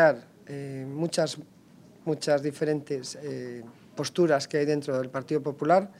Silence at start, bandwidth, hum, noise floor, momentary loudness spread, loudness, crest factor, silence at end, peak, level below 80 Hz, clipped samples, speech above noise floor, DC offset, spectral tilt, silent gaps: 0 s; 14.5 kHz; none; -54 dBFS; 15 LU; -28 LUFS; 20 dB; 0.05 s; -8 dBFS; -76 dBFS; under 0.1%; 26 dB; under 0.1%; -5.5 dB/octave; none